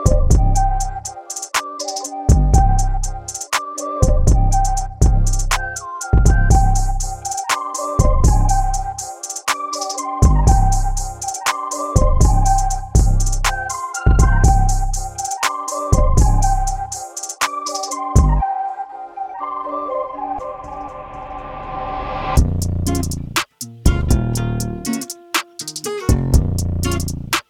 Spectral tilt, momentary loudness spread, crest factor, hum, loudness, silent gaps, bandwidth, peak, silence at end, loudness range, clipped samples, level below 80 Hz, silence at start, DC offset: -4.5 dB/octave; 11 LU; 16 dB; none; -19 LUFS; none; 16 kHz; 0 dBFS; 0.1 s; 5 LU; under 0.1%; -18 dBFS; 0 s; under 0.1%